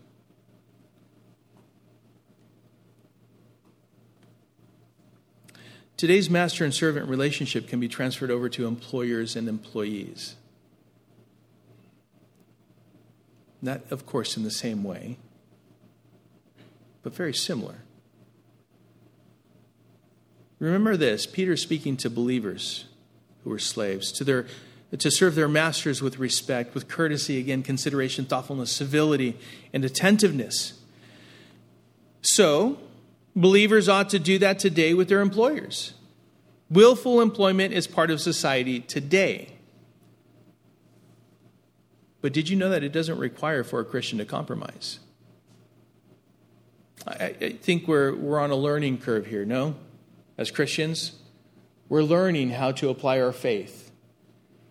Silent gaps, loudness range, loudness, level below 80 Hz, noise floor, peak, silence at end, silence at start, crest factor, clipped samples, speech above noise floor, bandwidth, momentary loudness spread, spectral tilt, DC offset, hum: none; 14 LU; -24 LUFS; -72 dBFS; -62 dBFS; -2 dBFS; 0.9 s; 5.65 s; 24 dB; under 0.1%; 38 dB; 16 kHz; 14 LU; -4.5 dB/octave; under 0.1%; none